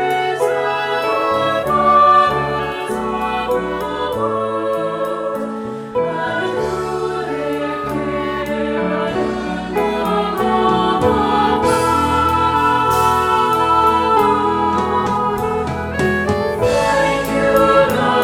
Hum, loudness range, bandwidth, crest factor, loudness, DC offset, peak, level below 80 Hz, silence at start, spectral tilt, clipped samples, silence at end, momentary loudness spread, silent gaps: none; 6 LU; 18 kHz; 14 dB; -16 LUFS; under 0.1%; -2 dBFS; -38 dBFS; 0 s; -5.5 dB/octave; under 0.1%; 0 s; 8 LU; none